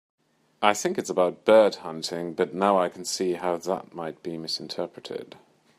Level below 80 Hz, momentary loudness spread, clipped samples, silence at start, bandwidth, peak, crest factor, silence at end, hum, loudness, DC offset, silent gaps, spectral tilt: -74 dBFS; 16 LU; under 0.1%; 0.6 s; 15.5 kHz; -2 dBFS; 24 dB; 0.55 s; none; -25 LUFS; under 0.1%; none; -4 dB/octave